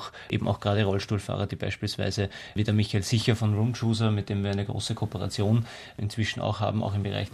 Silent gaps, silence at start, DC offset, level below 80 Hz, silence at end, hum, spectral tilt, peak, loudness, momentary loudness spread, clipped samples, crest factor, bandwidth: none; 0 s; under 0.1%; -56 dBFS; 0 s; none; -6 dB/octave; -8 dBFS; -28 LUFS; 6 LU; under 0.1%; 18 dB; 13 kHz